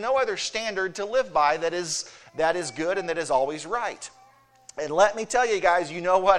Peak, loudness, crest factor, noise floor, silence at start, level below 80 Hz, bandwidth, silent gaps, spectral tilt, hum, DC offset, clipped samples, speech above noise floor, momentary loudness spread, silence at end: -4 dBFS; -25 LUFS; 20 dB; -56 dBFS; 0 s; -58 dBFS; 12 kHz; none; -2.5 dB/octave; none; under 0.1%; under 0.1%; 32 dB; 9 LU; 0 s